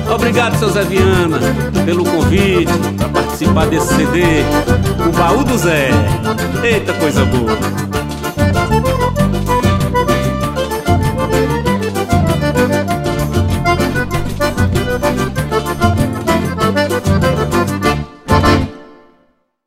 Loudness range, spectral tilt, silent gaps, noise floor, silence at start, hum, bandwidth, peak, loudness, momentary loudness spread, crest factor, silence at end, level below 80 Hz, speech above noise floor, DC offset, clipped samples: 2 LU; -6 dB/octave; none; -56 dBFS; 0 s; none; 16 kHz; 0 dBFS; -14 LUFS; 5 LU; 14 dB; 0.75 s; -26 dBFS; 44 dB; under 0.1%; under 0.1%